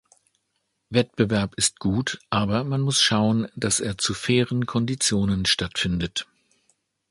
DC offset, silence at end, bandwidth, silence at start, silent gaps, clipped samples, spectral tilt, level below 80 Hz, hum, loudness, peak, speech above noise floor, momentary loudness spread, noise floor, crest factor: under 0.1%; 0.9 s; 11.5 kHz; 0.9 s; none; under 0.1%; -4 dB/octave; -46 dBFS; none; -23 LUFS; -4 dBFS; 52 dB; 6 LU; -75 dBFS; 20 dB